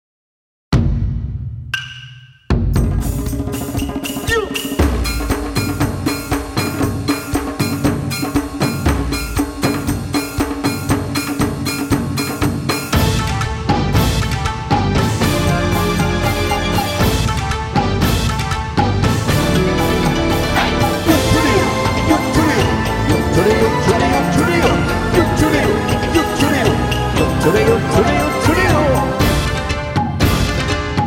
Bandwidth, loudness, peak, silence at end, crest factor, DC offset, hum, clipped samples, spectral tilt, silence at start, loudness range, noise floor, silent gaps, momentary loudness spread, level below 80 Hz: over 20 kHz; -16 LUFS; 0 dBFS; 0 s; 16 dB; under 0.1%; none; under 0.1%; -5.5 dB/octave; 0.7 s; 5 LU; -38 dBFS; none; 7 LU; -26 dBFS